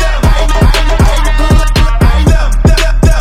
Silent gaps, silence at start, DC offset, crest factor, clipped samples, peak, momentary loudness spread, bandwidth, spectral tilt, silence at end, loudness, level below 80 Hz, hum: none; 0 s; under 0.1%; 6 dB; under 0.1%; 0 dBFS; 2 LU; 14 kHz; -5.5 dB/octave; 0 s; -10 LUFS; -8 dBFS; none